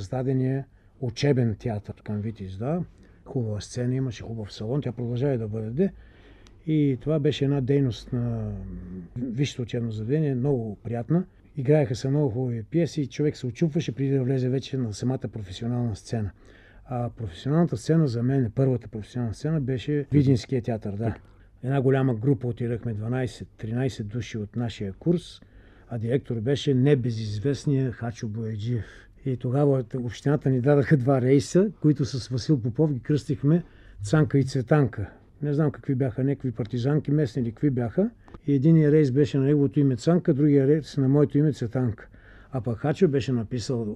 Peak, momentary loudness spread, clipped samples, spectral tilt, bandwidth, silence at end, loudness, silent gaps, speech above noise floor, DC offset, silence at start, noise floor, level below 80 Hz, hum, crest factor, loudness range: -6 dBFS; 12 LU; under 0.1%; -8 dB/octave; 10 kHz; 0 s; -26 LUFS; none; 26 dB; under 0.1%; 0 s; -50 dBFS; -52 dBFS; none; 18 dB; 7 LU